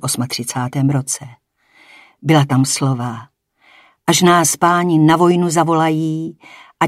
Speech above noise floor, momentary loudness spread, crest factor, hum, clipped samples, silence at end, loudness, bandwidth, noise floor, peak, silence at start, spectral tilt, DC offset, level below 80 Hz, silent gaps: 36 dB; 13 LU; 16 dB; none; under 0.1%; 0 s; -15 LUFS; 16 kHz; -51 dBFS; 0 dBFS; 0 s; -4.5 dB/octave; under 0.1%; -60 dBFS; none